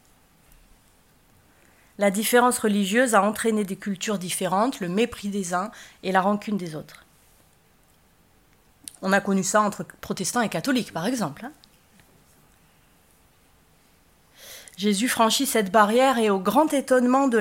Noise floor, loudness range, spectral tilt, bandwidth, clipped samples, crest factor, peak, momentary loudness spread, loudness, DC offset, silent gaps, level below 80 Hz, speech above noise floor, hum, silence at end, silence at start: -60 dBFS; 8 LU; -4 dB/octave; 16.5 kHz; under 0.1%; 22 dB; -4 dBFS; 15 LU; -23 LUFS; under 0.1%; none; -62 dBFS; 37 dB; none; 0 s; 2 s